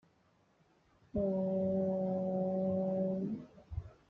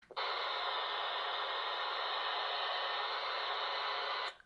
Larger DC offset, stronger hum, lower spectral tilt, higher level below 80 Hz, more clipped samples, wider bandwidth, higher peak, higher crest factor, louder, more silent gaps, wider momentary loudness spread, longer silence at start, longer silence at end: neither; neither; first, -11.5 dB/octave vs -0.5 dB/octave; first, -60 dBFS vs -80 dBFS; neither; second, 2.8 kHz vs 11 kHz; about the same, -24 dBFS vs -26 dBFS; about the same, 12 dB vs 12 dB; about the same, -35 LUFS vs -36 LUFS; neither; first, 12 LU vs 1 LU; first, 1.15 s vs 0.1 s; about the same, 0.15 s vs 0.1 s